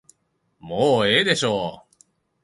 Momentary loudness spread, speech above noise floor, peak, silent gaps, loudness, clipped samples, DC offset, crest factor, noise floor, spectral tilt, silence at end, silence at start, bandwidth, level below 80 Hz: 13 LU; 49 dB; -2 dBFS; none; -20 LUFS; under 0.1%; under 0.1%; 20 dB; -69 dBFS; -4 dB/octave; 0.65 s; 0.65 s; 11.5 kHz; -58 dBFS